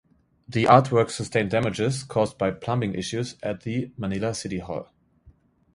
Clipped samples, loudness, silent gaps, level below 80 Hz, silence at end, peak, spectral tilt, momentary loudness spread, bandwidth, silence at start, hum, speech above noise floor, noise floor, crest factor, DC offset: under 0.1%; -24 LUFS; none; -54 dBFS; 0.45 s; 0 dBFS; -6 dB/octave; 14 LU; 11.5 kHz; 0.5 s; none; 33 dB; -57 dBFS; 24 dB; under 0.1%